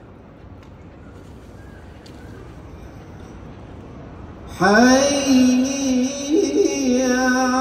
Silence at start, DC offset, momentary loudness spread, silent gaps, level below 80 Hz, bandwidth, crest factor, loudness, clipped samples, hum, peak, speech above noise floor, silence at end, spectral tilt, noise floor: 0.45 s; under 0.1%; 25 LU; none; -44 dBFS; 15.5 kHz; 18 dB; -17 LUFS; under 0.1%; none; -2 dBFS; 28 dB; 0 s; -4 dB/octave; -42 dBFS